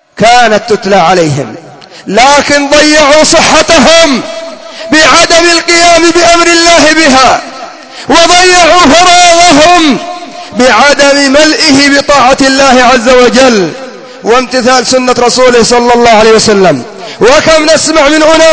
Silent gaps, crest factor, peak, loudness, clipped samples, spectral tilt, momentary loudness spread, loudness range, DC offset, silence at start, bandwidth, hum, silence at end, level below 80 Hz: none; 4 dB; 0 dBFS; -3 LUFS; 10%; -2.5 dB/octave; 13 LU; 2 LU; under 0.1%; 0.15 s; 8 kHz; none; 0 s; -32 dBFS